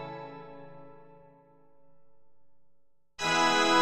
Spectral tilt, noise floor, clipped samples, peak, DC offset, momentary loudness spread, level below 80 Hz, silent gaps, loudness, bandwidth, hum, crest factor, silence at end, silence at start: -2.5 dB/octave; -72 dBFS; under 0.1%; -12 dBFS; under 0.1%; 26 LU; -66 dBFS; none; -26 LUFS; 14 kHz; none; 20 dB; 0 s; 0 s